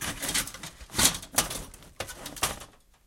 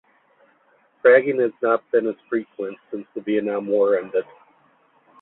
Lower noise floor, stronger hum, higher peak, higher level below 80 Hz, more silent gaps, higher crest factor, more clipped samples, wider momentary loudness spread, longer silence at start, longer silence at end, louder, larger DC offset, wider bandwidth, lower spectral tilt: second, -50 dBFS vs -60 dBFS; neither; about the same, -4 dBFS vs -2 dBFS; first, -48 dBFS vs -72 dBFS; neither; first, 28 dB vs 20 dB; neither; about the same, 18 LU vs 16 LU; second, 0 s vs 1.05 s; second, 0.35 s vs 1 s; second, -28 LUFS vs -21 LUFS; neither; first, 17 kHz vs 4.1 kHz; second, -1 dB/octave vs -10 dB/octave